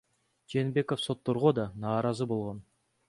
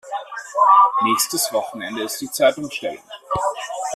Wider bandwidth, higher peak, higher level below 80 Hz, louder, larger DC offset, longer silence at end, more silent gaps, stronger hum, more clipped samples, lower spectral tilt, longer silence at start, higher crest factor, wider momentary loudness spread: second, 11.5 kHz vs 15.5 kHz; second, -10 dBFS vs -4 dBFS; second, -64 dBFS vs -56 dBFS; second, -31 LUFS vs -19 LUFS; neither; first, 0.5 s vs 0 s; neither; neither; neither; first, -7 dB/octave vs -2 dB/octave; first, 0.5 s vs 0.05 s; about the same, 20 dB vs 16 dB; second, 8 LU vs 16 LU